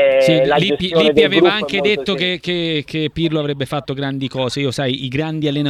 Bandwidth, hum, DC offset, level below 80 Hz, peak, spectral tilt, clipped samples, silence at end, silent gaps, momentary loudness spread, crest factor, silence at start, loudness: 14 kHz; none; under 0.1%; -48 dBFS; 0 dBFS; -6 dB/octave; under 0.1%; 0 s; none; 10 LU; 16 dB; 0 s; -16 LUFS